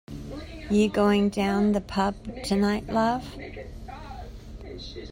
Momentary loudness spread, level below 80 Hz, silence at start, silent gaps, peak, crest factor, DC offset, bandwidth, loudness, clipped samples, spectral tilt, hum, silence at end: 19 LU; -44 dBFS; 0.1 s; none; -10 dBFS; 16 dB; under 0.1%; 16 kHz; -25 LUFS; under 0.1%; -6 dB/octave; none; 0 s